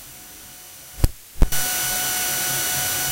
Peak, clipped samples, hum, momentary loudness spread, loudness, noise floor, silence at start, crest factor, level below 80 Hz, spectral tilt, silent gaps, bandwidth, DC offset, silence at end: -2 dBFS; under 0.1%; none; 18 LU; -21 LUFS; -41 dBFS; 0 s; 20 dB; -28 dBFS; -1.5 dB/octave; none; 16 kHz; under 0.1%; 0 s